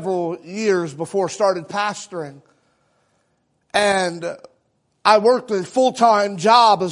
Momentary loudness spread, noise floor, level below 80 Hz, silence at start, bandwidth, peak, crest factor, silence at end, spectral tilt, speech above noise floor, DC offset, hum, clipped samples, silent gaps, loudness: 16 LU; -67 dBFS; -66 dBFS; 0 s; 11 kHz; 0 dBFS; 20 dB; 0 s; -4 dB/octave; 49 dB; under 0.1%; none; under 0.1%; none; -18 LUFS